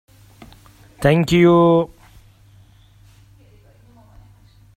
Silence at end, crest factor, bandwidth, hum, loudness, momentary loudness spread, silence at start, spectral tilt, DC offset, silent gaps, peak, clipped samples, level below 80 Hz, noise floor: 2.9 s; 20 dB; 14 kHz; none; -15 LUFS; 8 LU; 1 s; -7 dB/octave; under 0.1%; none; -2 dBFS; under 0.1%; -46 dBFS; -49 dBFS